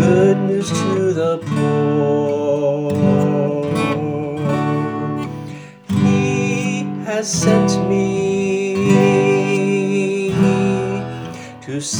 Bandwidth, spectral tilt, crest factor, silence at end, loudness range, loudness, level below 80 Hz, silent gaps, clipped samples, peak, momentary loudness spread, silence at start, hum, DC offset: 19.5 kHz; -6 dB/octave; 16 dB; 0 s; 4 LU; -17 LUFS; -52 dBFS; none; under 0.1%; 0 dBFS; 10 LU; 0 s; none; under 0.1%